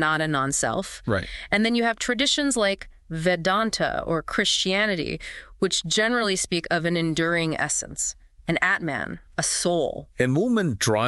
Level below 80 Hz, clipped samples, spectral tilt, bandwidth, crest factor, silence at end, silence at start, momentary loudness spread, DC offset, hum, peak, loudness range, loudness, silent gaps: -48 dBFS; under 0.1%; -3.5 dB/octave; 12.5 kHz; 18 dB; 0 s; 0 s; 8 LU; under 0.1%; none; -8 dBFS; 2 LU; -24 LUFS; none